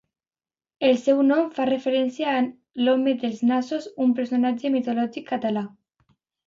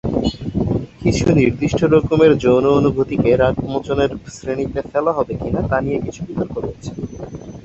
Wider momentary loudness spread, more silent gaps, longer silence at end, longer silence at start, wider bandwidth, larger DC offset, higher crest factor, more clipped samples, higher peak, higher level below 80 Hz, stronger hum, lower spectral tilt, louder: second, 8 LU vs 14 LU; neither; first, 0.8 s vs 0.05 s; first, 0.8 s vs 0.05 s; about the same, 7.6 kHz vs 8.2 kHz; neither; about the same, 16 dB vs 16 dB; neither; second, -8 dBFS vs 0 dBFS; second, -72 dBFS vs -36 dBFS; neither; about the same, -6 dB/octave vs -7 dB/octave; second, -23 LUFS vs -17 LUFS